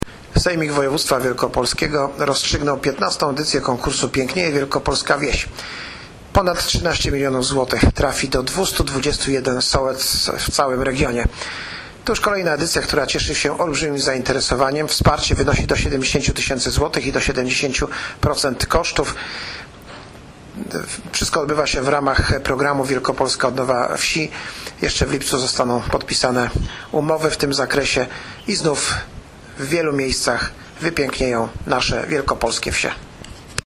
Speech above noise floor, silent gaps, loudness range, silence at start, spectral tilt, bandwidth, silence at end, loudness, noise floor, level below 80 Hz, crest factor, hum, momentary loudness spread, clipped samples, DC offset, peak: 20 dB; none; 3 LU; 0 s; -3.5 dB/octave; 15.5 kHz; 0.05 s; -19 LUFS; -39 dBFS; -32 dBFS; 18 dB; none; 10 LU; under 0.1%; under 0.1%; 0 dBFS